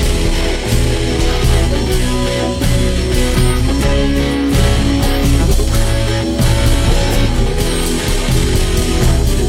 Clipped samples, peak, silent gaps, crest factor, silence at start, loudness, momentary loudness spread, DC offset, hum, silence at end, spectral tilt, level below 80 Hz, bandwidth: under 0.1%; -2 dBFS; none; 12 dB; 0 s; -15 LUFS; 3 LU; under 0.1%; none; 0 s; -5 dB/octave; -14 dBFS; 16.5 kHz